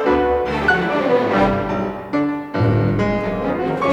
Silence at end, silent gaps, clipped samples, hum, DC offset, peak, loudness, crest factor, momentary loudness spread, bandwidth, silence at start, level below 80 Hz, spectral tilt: 0 s; none; under 0.1%; none; under 0.1%; -4 dBFS; -18 LUFS; 14 dB; 5 LU; 9.4 kHz; 0 s; -38 dBFS; -8 dB/octave